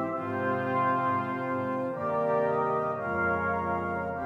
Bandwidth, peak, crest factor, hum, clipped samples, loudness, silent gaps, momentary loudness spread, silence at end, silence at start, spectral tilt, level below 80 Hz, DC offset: 10 kHz; -16 dBFS; 12 dB; none; under 0.1%; -29 LUFS; none; 4 LU; 0 s; 0 s; -8.5 dB/octave; -60 dBFS; under 0.1%